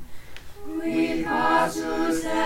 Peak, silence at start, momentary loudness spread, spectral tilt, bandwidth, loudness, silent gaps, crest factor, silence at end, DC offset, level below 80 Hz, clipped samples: -8 dBFS; 0 s; 23 LU; -4.5 dB/octave; 16.5 kHz; -24 LUFS; none; 16 dB; 0 s; under 0.1%; -46 dBFS; under 0.1%